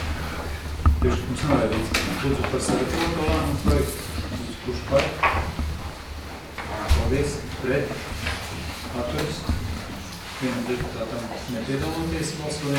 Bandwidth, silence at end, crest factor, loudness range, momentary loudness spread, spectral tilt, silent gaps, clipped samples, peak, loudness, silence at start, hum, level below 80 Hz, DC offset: 18.5 kHz; 0 s; 20 dB; 5 LU; 10 LU; -5.5 dB/octave; none; under 0.1%; -6 dBFS; -26 LUFS; 0 s; none; -32 dBFS; under 0.1%